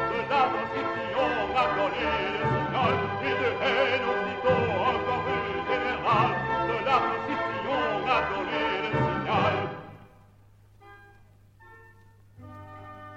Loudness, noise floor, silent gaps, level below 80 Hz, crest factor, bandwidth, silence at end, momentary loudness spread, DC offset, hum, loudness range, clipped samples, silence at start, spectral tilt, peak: -26 LUFS; -56 dBFS; none; -52 dBFS; 18 dB; 8.2 kHz; 0 s; 5 LU; under 0.1%; none; 5 LU; under 0.1%; 0 s; -6.5 dB/octave; -10 dBFS